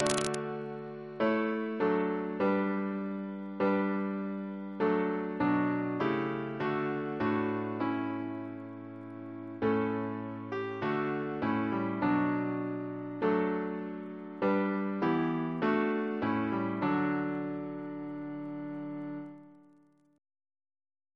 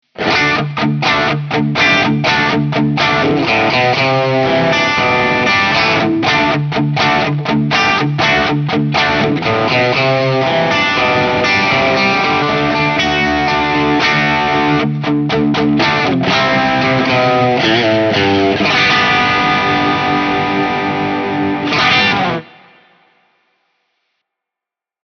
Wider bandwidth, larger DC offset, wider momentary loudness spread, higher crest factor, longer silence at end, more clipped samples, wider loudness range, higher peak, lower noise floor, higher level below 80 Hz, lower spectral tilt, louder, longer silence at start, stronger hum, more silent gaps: first, 11 kHz vs 7 kHz; neither; first, 11 LU vs 4 LU; first, 24 dB vs 14 dB; second, 1.55 s vs 2.6 s; neither; about the same, 4 LU vs 3 LU; second, -8 dBFS vs 0 dBFS; second, -64 dBFS vs -86 dBFS; second, -70 dBFS vs -44 dBFS; about the same, -6.5 dB/octave vs -5.5 dB/octave; second, -33 LUFS vs -12 LUFS; second, 0 s vs 0.2 s; neither; neither